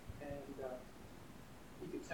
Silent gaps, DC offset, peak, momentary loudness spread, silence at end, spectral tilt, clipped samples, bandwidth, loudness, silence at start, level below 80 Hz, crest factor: none; under 0.1%; -30 dBFS; 9 LU; 0 s; -6 dB/octave; under 0.1%; 19 kHz; -51 LUFS; 0 s; -62 dBFS; 20 dB